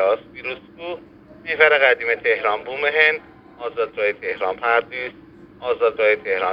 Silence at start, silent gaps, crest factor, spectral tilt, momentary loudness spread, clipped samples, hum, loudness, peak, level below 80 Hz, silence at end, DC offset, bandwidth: 0 s; none; 20 dB; -5 dB/octave; 17 LU; under 0.1%; none; -19 LUFS; 0 dBFS; -60 dBFS; 0 s; under 0.1%; 5.4 kHz